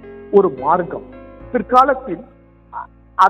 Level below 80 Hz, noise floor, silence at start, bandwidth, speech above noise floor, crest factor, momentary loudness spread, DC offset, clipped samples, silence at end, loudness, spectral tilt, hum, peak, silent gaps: -46 dBFS; -34 dBFS; 0.05 s; 8.4 kHz; 18 dB; 18 dB; 20 LU; under 0.1%; under 0.1%; 0 s; -16 LUFS; -7 dB/octave; none; 0 dBFS; none